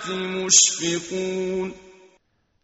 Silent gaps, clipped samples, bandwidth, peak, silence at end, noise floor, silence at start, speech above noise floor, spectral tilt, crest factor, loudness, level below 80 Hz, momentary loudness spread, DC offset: none; under 0.1%; 8.2 kHz; -2 dBFS; 0.75 s; -65 dBFS; 0 s; 43 dB; -1.5 dB/octave; 22 dB; -19 LUFS; -62 dBFS; 14 LU; under 0.1%